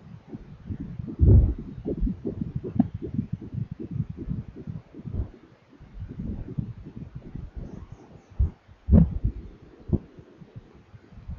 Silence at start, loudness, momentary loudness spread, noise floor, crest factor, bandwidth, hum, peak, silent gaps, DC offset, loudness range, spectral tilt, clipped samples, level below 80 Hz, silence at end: 0 s; -28 LUFS; 26 LU; -52 dBFS; 22 dB; 3.4 kHz; none; -6 dBFS; none; under 0.1%; 12 LU; -12 dB/octave; under 0.1%; -32 dBFS; 0 s